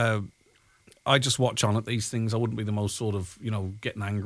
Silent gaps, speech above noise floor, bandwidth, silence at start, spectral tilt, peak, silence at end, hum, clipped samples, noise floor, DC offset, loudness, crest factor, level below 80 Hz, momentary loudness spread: none; 36 dB; 11 kHz; 0 s; -4.5 dB/octave; -6 dBFS; 0 s; none; under 0.1%; -63 dBFS; under 0.1%; -28 LUFS; 22 dB; -58 dBFS; 10 LU